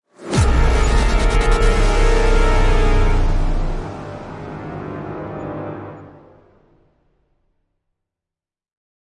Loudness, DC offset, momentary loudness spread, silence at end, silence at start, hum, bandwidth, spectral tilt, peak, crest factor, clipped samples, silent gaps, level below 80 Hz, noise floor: -20 LUFS; under 0.1%; 14 LU; 3.1 s; 0.2 s; none; 11 kHz; -5.5 dB/octave; -2 dBFS; 14 dB; under 0.1%; none; -18 dBFS; -88 dBFS